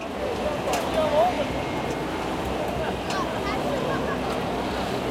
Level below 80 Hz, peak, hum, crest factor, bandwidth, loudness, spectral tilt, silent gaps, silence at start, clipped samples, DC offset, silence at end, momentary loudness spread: -42 dBFS; -10 dBFS; none; 16 dB; 16.5 kHz; -26 LUFS; -5 dB/octave; none; 0 s; under 0.1%; under 0.1%; 0 s; 6 LU